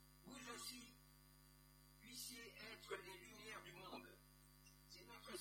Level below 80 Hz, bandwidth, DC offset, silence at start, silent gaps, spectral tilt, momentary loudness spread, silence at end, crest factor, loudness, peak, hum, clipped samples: -74 dBFS; 17 kHz; under 0.1%; 0 s; none; -2.5 dB/octave; 15 LU; 0 s; 22 dB; -56 LUFS; -36 dBFS; 50 Hz at -70 dBFS; under 0.1%